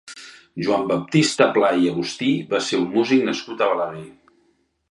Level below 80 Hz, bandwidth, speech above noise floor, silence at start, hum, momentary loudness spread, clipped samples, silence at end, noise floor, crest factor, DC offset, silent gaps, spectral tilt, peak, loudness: -64 dBFS; 11.5 kHz; 44 dB; 0.05 s; none; 13 LU; under 0.1%; 0.8 s; -64 dBFS; 20 dB; under 0.1%; none; -5 dB/octave; 0 dBFS; -20 LUFS